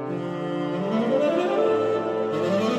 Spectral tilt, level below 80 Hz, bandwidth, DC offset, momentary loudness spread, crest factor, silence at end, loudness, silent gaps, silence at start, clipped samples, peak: -7 dB/octave; -68 dBFS; 10.5 kHz; under 0.1%; 7 LU; 14 dB; 0 s; -24 LUFS; none; 0 s; under 0.1%; -10 dBFS